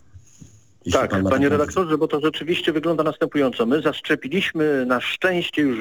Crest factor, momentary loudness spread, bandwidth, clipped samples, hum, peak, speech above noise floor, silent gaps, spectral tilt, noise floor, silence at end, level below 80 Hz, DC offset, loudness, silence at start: 18 dB; 3 LU; 19 kHz; under 0.1%; none; -4 dBFS; 28 dB; none; -5.5 dB/octave; -48 dBFS; 0 s; -52 dBFS; under 0.1%; -21 LUFS; 0.15 s